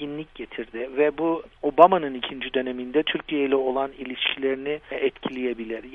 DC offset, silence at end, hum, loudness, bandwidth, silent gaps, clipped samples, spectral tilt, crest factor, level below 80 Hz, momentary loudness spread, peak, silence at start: under 0.1%; 0 s; none; -24 LUFS; 4.3 kHz; none; under 0.1%; -7 dB/octave; 24 dB; -56 dBFS; 15 LU; 0 dBFS; 0 s